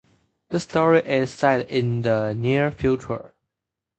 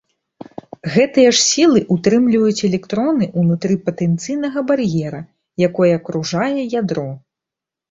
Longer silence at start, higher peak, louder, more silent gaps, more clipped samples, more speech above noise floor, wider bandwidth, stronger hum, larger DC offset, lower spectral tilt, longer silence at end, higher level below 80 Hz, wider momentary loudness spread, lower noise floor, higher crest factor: second, 0.5 s vs 0.85 s; about the same, -4 dBFS vs -2 dBFS; second, -22 LUFS vs -16 LUFS; neither; neither; second, 64 dB vs 70 dB; about the same, 8.8 kHz vs 8 kHz; neither; neither; first, -7 dB/octave vs -5 dB/octave; about the same, 0.7 s vs 0.75 s; first, -50 dBFS vs -56 dBFS; second, 10 LU vs 17 LU; about the same, -85 dBFS vs -86 dBFS; about the same, 18 dB vs 16 dB